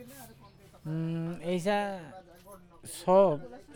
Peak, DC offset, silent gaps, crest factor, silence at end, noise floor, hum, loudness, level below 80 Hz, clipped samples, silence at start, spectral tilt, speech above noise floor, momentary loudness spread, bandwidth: -12 dBFS; under 0.1%; none; 20 dB; 0 s; -55 dBFS; none; -29 LUFS; -64 dBFS; under 0.1%; 0 s; -6.5 dB/octave; 27 dB; 25 LU; 18.5 kHz